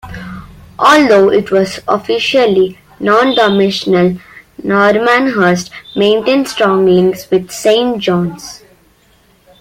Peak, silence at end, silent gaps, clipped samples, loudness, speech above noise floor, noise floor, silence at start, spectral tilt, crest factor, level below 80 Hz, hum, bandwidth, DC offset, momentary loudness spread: 0 dBFS; 1.05 s; none; under 0.1%; -11 LUFS; 39 dB; -50 dBFS; 0.05 s; -5 dB/octave; 12 dB; -46 dBFS; none; 16 kHz; under 0.1%; 13 LU